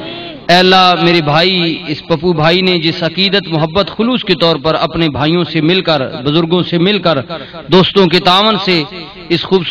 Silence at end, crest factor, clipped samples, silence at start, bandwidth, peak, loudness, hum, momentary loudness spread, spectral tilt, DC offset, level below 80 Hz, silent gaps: 0 s; 12 dB; under 0.1%; 0 s; 11.5 kHz; 0 dBFS; -11 LUFS; none; 9 LU; -6 dB/octave; under 0.1%; -42 dBFS; none